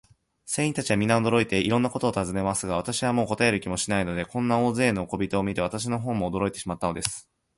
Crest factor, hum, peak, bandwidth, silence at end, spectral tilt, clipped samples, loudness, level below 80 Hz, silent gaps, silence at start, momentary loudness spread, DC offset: 22 dB; none; -4 dBFS; 11.5 kHz; 0.35 s; -5 dB/octave; under 0.1%; -26 LUFS; -50 dBFS; none; 0.45 s; 7 LU; under 0.1%